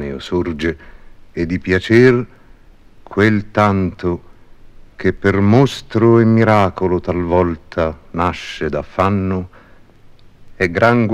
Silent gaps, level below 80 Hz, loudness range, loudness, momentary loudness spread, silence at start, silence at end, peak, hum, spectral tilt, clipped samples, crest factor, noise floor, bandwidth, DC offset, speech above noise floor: none; -40 dBFS; 5 LU; -16 LUFS; 12 LU; 0 s; 0 s; 0 dBFS; none; -7.5 dB/octave; under 0.1%; 16 dB; -43 dBFS; 11 kHz; 0.2%; 28 dB